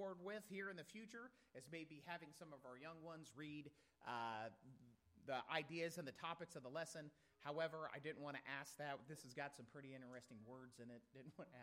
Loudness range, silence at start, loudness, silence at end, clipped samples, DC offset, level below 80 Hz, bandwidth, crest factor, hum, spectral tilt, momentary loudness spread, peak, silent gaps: 6 LU; 0 s; -53 LUFS; 0 s; under 0.1%; under 0.1%; -90 dBFS; 16 kHz; 26 dB; none; -4.5 dB/octave; 13 LU; -28 dBFS; none